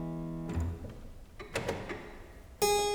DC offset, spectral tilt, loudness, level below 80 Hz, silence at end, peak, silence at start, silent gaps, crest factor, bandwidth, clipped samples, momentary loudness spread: under 0.1%; -4 dB/octave; -36 LUFS; -48 dBFS; 0 s; -16 dBFS; 0 s; none; 20 dB; over 20 kHz; under 0.1%; 21 LU